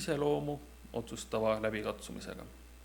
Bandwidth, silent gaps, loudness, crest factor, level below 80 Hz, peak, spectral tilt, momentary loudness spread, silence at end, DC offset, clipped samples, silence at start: 19 kHz; none; -36 LUFS; 18 dB; -54 dBFS; -18 dBFS; -5 dB/octave; 13 LU; 0 s; under 0.1%; under 0.1%; 0 s